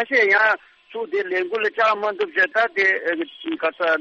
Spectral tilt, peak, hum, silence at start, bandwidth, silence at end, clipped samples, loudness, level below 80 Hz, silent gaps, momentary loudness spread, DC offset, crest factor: -3.5 dB/octave; -6 dBFS; none; 0 s; 7.6 kHz; 0 s; under 0.1%; -20 LUFS; -74 dBFS; none; 11 LU; under 0.1%; 14 dB